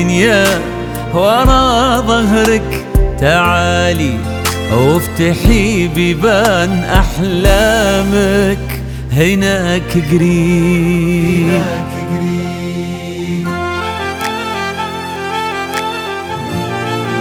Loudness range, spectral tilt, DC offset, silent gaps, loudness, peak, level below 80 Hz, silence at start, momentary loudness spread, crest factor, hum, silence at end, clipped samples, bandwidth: 7 LU; -5.5 dB/octave; under 0.1%; none; -13 LUFS; 0 dBFS; -22 dBFS; 0 s; 10 LU; 12 dB; none; 0 s; under 0.1%; 20 kHz